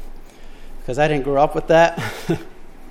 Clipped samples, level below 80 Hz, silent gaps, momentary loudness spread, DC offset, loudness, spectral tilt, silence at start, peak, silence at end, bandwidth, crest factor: under 0.1%; -34 dBFS; none; 12 LU; under 0.1%; -18 LUFS; -6 dB/octave; 0 s; -2 dBFS; 0 s; 16 kHz; 18 dB